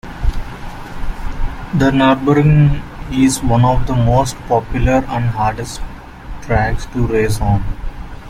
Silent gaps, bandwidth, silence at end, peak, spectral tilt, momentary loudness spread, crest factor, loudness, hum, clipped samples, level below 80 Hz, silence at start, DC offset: none; 15.5 kHz; 0 s; 0 dBFS; -6.5 dB/octave; 18 LU; 14 dB; -15 LUFS; none; under 0.1%; -24 dBFS; 0.05 s; under 0.1%